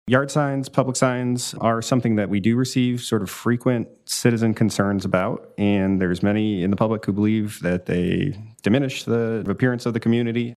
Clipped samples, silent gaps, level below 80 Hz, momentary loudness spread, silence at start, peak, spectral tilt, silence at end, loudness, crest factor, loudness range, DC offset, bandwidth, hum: under 0.1%; none; -56 dBFS; 4 LU; 0.05 s; -2 dBFS; -6 dB/octave; 0 s; -22 LUFS; 20 dB; 1 LU; under 0.1%; 14 kHz; none